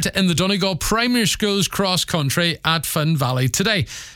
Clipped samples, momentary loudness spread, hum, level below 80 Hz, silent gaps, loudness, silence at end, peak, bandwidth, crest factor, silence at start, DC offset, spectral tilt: under 0.1%; 2 LU; none; -40 dBFS; none; -19 LUFS; 0 s; -2 dBFS; 18.5 kHz; 18 dB; 0 s; under 0.1%; -4 dB/octave